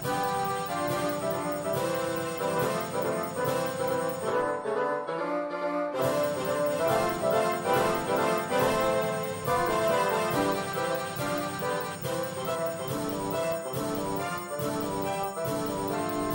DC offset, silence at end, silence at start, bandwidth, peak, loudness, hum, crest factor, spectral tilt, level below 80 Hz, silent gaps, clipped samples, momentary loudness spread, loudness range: under 0.1%; 0 s; 0 s; 16.5 kHz; -14 dBFS; -29 LUFS; none; 14 dB; -4.5 dB/octave; -60 dBFS; none; under 0.1%; 5 LU; 4 LU